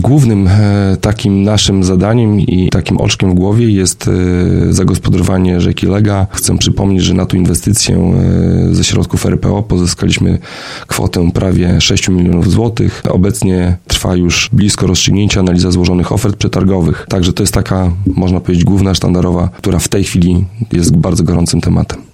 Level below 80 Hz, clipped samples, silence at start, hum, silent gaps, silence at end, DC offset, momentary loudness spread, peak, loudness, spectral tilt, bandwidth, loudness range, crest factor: -26 dBFS; under 0.1%; 0 s; none; none; 0.1 s; under 0.1%; 4 LU; 0 dBFS; -11 LUFS; -5.5 dB/octave; 16 kHz; 1 LU; 10 dB